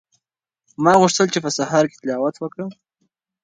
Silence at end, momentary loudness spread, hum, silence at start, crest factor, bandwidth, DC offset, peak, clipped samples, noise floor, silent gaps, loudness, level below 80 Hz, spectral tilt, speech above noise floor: 0.7 s; 15 LU; none; 0.8 s; 20 dB; 11 kHz; under 0.1%; 0 dBFS; under 0.1%; -82 dBFS; none; -18 LUFS; -62 dBFS; -4.5 dB/octave; 64 dB